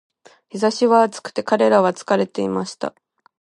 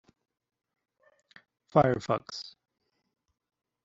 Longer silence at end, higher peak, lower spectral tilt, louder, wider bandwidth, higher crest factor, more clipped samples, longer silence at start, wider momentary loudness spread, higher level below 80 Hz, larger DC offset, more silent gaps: second, 0.55 s vs 1.35 s; first, -2 dBFS vs -6 dBFS; about the same, -5 dB/octave vs -5.5 dB/octave; first, -19 LUFS vs -28 LUFS; first, 11.5 kHz vs 7.8 kHz; second, 18 dB vs 28 dB; neither; second, 0.55 s vs 1.75 s; second, 13 LU vs 17 LU; about the same, -68 dBFS vs -66 dBFS; neither; neither